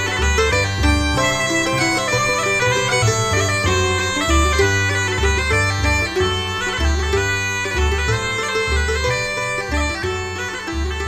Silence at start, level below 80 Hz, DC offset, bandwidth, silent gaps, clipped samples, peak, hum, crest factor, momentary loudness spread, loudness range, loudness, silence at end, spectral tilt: 0 s; -26 dBFS; 0.1%; 15.5 kHz; none; under 0.1%; -4 dBFS; none; 14 dB; 5 LU; 3 LU; -18 LUFS; 0 s; -3.5 dB/octave